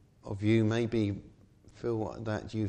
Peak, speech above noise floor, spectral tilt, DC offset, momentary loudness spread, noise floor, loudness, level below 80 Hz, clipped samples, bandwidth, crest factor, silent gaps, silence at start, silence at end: -16 dBFS; 27 dB; -7.5 dB/octave; under 0.1%; 12 LU; -57 dBFS; -32 LUFS; -58 dBFS; under 0.1%; 8.8 kHz; 16 dB; none; 0.25 s; 0 s